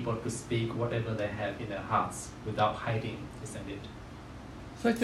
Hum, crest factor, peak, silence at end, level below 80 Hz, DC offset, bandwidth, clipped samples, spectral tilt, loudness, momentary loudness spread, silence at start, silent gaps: none; 20 dB; -14 dBFS; 0 s; -54 dBFS; under 0.1%; 13.5 kHz; under 0.1%; -5.5 dB/octave; -34 LUFS; 15 LU; 0 s; none